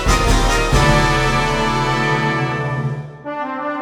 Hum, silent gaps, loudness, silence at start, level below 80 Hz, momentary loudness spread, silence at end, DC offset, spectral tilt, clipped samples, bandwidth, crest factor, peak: none; none; -17 LUFS; 0 s; -22 dBFS; 11 LU; 0 s; under 0.1%; -4.5 dB/octave; under 0.1%; 16 kHz; 16 dB; -2 dBFS